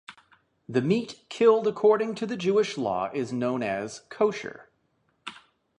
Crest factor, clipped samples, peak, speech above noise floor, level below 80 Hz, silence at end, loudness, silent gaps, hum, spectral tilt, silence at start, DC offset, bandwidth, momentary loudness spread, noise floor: 18 dB; under 0.1%; -8 dBFS; 46 dB; -70 dBFS; 0.45 s; -26 LUFS; none; none; -6 dB/octave; 0.1 s; under 0.1%; 10 kHz; 18 LU; -71 dBFS